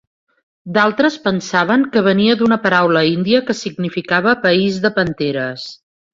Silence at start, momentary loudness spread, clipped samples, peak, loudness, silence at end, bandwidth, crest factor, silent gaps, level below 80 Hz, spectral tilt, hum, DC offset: 0.65 s; 9 LU; under 0.1%; -2 dBFS; -15 LUFS; 0.4 s; 7.8 kHz; 14 dB; none; -56 dBFS; -5.5 dB/octave; none; under 0.1%